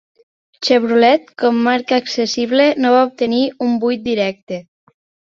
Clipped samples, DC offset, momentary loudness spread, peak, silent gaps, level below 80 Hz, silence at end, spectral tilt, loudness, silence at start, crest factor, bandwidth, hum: under 0.1%; under 0.1%; 8 LU; 0 dBFS; 4.42-4.47 s; -60 dBFS; 0.8 s; -4.5 dB/octave; -15 LUFS; 0.6 s; 16 dB; 7.4 kHz; none